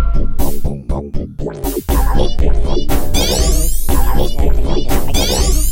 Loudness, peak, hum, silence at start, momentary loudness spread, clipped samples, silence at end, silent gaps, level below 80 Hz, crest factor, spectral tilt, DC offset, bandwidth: -18 LUFS; 0 dBFS; none; 0 s; 9 LU; under 0.1%; 0 s; none; -14 dBFS; 10 dB; -4.5 dB/octave; under 0.1%; 16.5 kHz